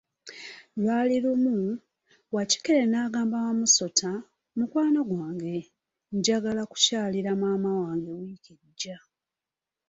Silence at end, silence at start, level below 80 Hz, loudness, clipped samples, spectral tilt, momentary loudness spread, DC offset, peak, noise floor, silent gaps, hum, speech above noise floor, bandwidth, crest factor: 0.9 s; 0.25 s; -70 dBFS; -26 LUFS; under 0.1%; -3.5 dB/octave; 15 LU; under 0.1%; -6 dBFS; -90 dBFS; none; none; 63 dB; 8 kHz; 22 dB